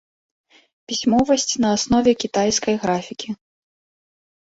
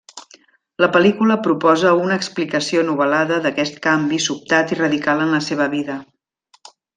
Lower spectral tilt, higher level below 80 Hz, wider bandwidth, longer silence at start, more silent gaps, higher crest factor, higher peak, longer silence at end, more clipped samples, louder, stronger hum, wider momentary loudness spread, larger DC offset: about the same, -3.5 dB/octave vs -4.5 dB/octave; first, -50 dBFS vs -62 dBFS; second, 8 kHz vs 9.6 kHz; first, 0.9 s vs 0.15 s; neither; about the same, 18 dB vs 16 dB; about the same, -4 dBFS vs -2 dBFS; first, 1.25 s vs 0.95 s; neither; about the same, -19 LUFS vs -17 LUFS; neither; first, 13 LU vs 7 LU; neither